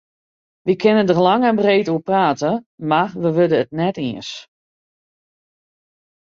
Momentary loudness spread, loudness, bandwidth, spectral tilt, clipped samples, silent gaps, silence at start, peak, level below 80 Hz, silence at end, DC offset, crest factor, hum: 11 LU; -17 LUFS; 7.6 kHz; -6.5 dB/octave; under 0.1%; 2.66-2.78 s; 0.65 s; -2 dBFS; -62 dBFS; 1.9 s; under 0.1%; 16 dB; none